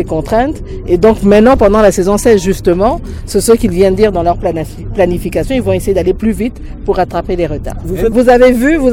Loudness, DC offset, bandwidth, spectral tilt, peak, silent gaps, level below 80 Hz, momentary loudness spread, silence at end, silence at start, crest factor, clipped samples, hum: -11 LUFS; under 0.1%; 17 kHz; -6 dB/octave; 0 dBFS; none; -24 dBFS; 11 LU; 0 s; 0 s; 10 dB; 0.6%; none